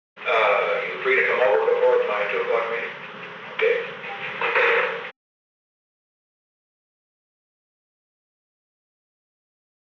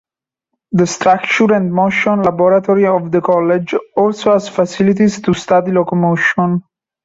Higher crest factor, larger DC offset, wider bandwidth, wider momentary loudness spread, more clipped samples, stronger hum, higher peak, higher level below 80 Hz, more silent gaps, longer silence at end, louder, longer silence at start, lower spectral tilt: first, 18 dB vs 12 dB; neither; second, 6.8 kHz vs 8 kHz; first, 13 LU vs 5 LU; neither; neither; second, -6 dBFS vs -2 dBFS; second, under -90 dBFS vs -52 dBFS; neither; first, 4.8 s vs 0.45 s; second, -21 LUFS vs -13 LUFS; second, 0.15 s vs 0.7 s; second, -4 dB/octave vs -6 dB/octave